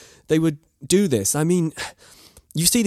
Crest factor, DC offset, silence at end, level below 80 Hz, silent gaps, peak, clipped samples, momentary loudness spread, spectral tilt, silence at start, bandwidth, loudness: 20 dB; under 0.1%; 0 s; -52 dBFS; none; -2 dBFS; under 0.1%; 14 LU; -4.5 dB/octave; 0.3 s; 15 kHz; -21 LUFS